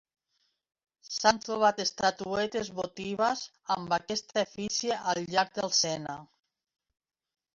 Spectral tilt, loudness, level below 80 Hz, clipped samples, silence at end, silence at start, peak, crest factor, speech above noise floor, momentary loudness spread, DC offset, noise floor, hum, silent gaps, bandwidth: -2.5 dB/octave; -29 LUFS; -66 dBFS; under 0.1%; 1.3 s; 1.05 s; -8 dBFS; 24 dB; 47 dB; 10 LU; under 0.1%; -77 dBFS; none; none; 7.8 kHz